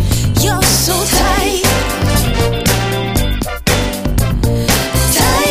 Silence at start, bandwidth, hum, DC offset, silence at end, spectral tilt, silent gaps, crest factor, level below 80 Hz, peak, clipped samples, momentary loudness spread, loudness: 0 s; 16 kHz; none; under 0.1%; 0 s; -4 dB/octave; none; 14 dB; -20 dBFS; 0 dBFS; under 0.1%; 5 LU; -13 LUFS